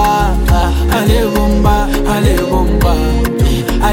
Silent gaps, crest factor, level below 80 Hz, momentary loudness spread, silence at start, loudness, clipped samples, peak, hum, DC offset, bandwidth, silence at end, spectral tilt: none; 10 dB; -14 dBFS; 2 LU; 0 s; -13 LUFS; under 0.1%; 0 dBFS; none; under 0.1%; 17 kHz; 0 s; -6 dB/octave